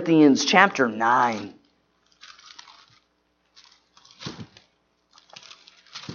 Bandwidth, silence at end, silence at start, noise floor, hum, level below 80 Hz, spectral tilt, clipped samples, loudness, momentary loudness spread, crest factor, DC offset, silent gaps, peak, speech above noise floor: 7.2 kHz; 0 s; 0 s; -69 dBFS; none; -72 dBFS; -4 dB/octave; under 0.1%; -19 LUFS; 27 LU; 24 dB; under 0.1%; none; 0 dBFS; 50 dB